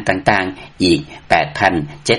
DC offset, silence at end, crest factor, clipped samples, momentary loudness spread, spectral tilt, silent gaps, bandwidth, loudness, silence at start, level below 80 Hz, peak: under 0.1%; 0 s; 16 dB; under 0.1%; 5 LU; -4.5 dB/octave; none; 11.5 kHz; -16 LUFS; 0 s; -42 dBFS; 0 dBFS